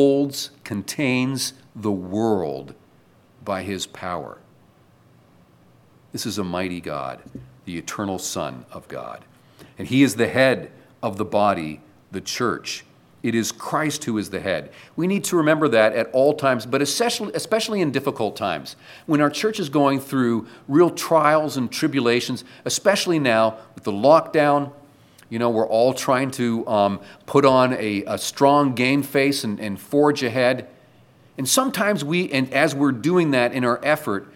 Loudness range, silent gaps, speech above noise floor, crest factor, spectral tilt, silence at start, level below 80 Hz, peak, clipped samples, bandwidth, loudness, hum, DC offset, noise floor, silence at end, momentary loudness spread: 11 LU; none; 34 dB; 20 dB; -4.5 dB/octave; 0 s; -64 dBFS; -2 dBFS; under 0.1%; 17 kHz; -21 LUFS; none; under 0.1%; -55 dBFS; 0.1 s; 14 LU